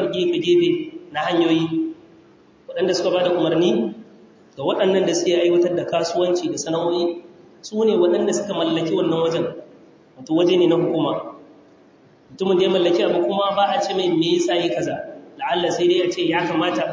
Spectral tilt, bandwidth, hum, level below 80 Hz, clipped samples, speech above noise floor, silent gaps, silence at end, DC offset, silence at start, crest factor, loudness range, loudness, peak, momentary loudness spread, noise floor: -5 dB/octave; 7.6 kHz; none; -64 dBFS; under 0.1%; 32 dB; none; 0 s; under 0.1%; 0 s; 14 dB; 2 LU; -20 LUFS; -6 dBFS; 11 LU; -51 dBFS